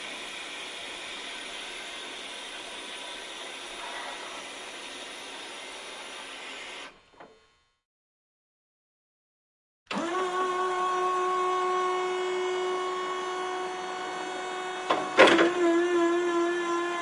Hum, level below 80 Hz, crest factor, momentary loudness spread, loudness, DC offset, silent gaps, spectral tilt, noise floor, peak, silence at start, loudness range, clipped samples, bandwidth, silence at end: none; -70 dBFS; 26 dB; 14 LU; -29 LUFS; under 0.1%; 7.85-9.86 s; -2.5 dB/octave; -65 dBFS; -4 dBFS; 0 s; 17 LU; under 0.1%; 11.5 kHz; 0 s